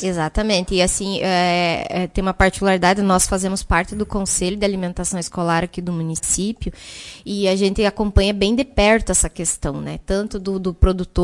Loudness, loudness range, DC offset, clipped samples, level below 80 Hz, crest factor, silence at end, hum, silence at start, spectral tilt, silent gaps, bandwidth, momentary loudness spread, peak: -19 LUFS; 4 LU; under 0.1%; under 0.1%; -28 dBFS; 18 dB; 0 s; none; 0 s; -4 dB/octave; none; 11.5 kHz; 9 LU; -2 dBFS